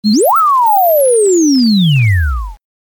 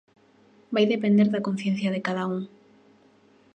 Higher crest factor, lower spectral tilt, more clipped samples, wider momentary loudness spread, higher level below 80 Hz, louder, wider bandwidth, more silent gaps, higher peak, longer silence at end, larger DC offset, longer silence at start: second, 6 dB vs 18 dB; second, -5 dB/octave vs -7 dB/octave; neither; about the same, 8 LU vs 10 LU; first, -26 dBFS vs -74 dBFS; first, -10 LUFS vs -25 LUFS; first, 19 kHz vs 8.6 kHz; neither; first, -4 dBFS vs -10 dBFS; second, 0.3 s vs 1.1 s; neither; second, 0.05 s vs 0.7 s